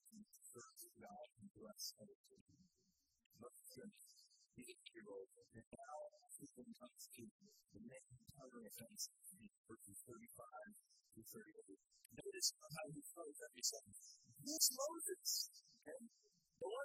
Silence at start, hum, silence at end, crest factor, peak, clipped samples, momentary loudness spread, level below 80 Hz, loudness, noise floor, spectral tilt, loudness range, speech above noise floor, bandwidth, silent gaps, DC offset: 0.05 s; none; 0 s; 32 dB; -22 dBFS; under 0.1%; 22 LU; -88 dBFS; -48 LUFS; -85 dBFS; -1 dB/octave; 16 LU; 32 dB; 15.5 kHz; 1.51-1.55 s, 2.15-2.24 s, 2.41-2.46 s, 3.26-3.30 s, 5.67-5.71 s, 7.31-7.39 s, 9.58-9.64 s; under 0.1%